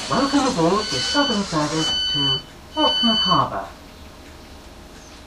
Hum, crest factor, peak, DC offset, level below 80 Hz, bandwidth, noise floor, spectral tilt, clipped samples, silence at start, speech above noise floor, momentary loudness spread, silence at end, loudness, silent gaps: none; 18 dB; -4 dBFS; under 0.1%; -44 dBFS; 14.5 kHz; -41 dBFS; -3.5 dB/octave; under 0.1%; 0 s; 21 dB; 9 LU; 0 s; -19 LUFS; none